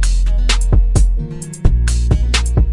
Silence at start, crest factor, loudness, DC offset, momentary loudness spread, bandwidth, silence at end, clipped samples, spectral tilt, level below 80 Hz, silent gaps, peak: 0 s; 12 dB; -16 LUFS; under 0.1%; 5 LU; 11.5 kHz; 0 s; under 0.1%; -4.5 dB/octave; -14 dBFS; none; 0 dBFS